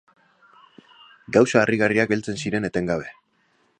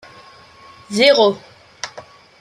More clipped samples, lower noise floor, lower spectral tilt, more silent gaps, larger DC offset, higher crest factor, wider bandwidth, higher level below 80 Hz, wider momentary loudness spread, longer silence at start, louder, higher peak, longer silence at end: neither; first, -65 dBFS vs -44 dBFS; first, -5.5 dB/octave vs -3 dB/octave; neither; neither; about the same, 22 dB vs 18 dB; second, 10 kHz vs 13 kHz; first, -56 dBFS vs -66 dBFS; second, 9 LU vs 20 LU; first, 1.3 s vs 0.9 s; second, -21 LUFS vs -14 LUFS; about the same, -2 dBFS vs 0 dBFS; first, 0.7 s vs 0.4 s